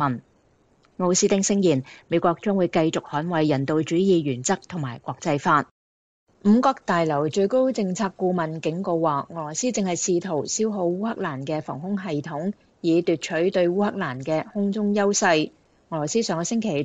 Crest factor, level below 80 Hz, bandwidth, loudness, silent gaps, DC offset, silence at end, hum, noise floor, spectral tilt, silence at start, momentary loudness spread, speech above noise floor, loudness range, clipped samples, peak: 16 dB; -64 dBFS; 9.2 kHz; -23 LUFS; 5.71-6.27 s; under 0.1%; 0 s; none; -61 dBFS; -5 dB/octave; 0 s; 9 LU; 38 dB; 3 LU; under 0.1%; -6 dBFS